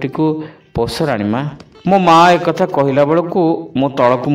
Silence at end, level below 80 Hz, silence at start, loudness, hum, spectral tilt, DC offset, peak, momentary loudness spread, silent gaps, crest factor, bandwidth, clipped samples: 0 s; -44 dBFS; 0 s; -14 LUFS; none; -6.5 dB/octave; under 0.1%; 0 dBFS; 13 LU; none; 14 dB; 16 kHz; under 0.1%